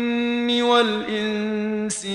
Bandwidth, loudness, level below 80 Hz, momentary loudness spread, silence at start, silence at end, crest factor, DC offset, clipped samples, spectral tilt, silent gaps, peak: 11.5 kHz; -21 LUFS; -60 dBFS; 7 LU; 0 s; 0 s; 18 dB; under 0.1%; under 0.1%; -3.5 dB/octave; none; -4 dBFS